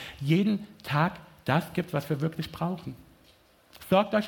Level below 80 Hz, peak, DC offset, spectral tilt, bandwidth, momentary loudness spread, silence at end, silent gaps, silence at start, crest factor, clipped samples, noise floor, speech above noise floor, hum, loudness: -60 dBFS; -8 dBFS; under 0.1%; -7 dB/octave; 17.5 kHz; 13 LU; 0 s; none; 0 s; 22 dB; under 0.1%; -60 dBFS; 33 dB; none; -29 LUFS